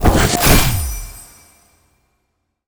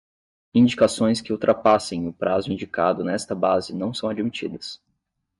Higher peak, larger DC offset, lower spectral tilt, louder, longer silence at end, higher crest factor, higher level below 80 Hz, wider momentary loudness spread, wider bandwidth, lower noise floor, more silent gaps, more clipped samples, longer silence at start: first, 0 dBFS vs -6 dBFS; neither; second, -4 dB/octave vs -5.5 dB/octave; first, -14 LUFS vs -22 LUFS; first, 1.45 s vs 0.65 s; about the same, 18 dB vs 16 dB; first, -22 dBFS vs -62 dBFS; first, 22 LU vs 11 LU; first, over 20 kHz vs 11.5 kHz; second, -70 dBFS vs -75 dBFS; neither; neither; second, 0 s vs 0.55 s